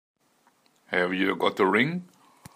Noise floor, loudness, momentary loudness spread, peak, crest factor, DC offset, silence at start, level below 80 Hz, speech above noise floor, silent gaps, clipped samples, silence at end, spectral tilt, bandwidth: -66 dBFS; -25 LUFS; 7 LU; -8 dBFS; 20 dB; under 0.1%; 0.9 s; -72 dBFS; 41 dB; none; under 0.1%; 0.5 s; -6 dB/octave; 15.5 kHz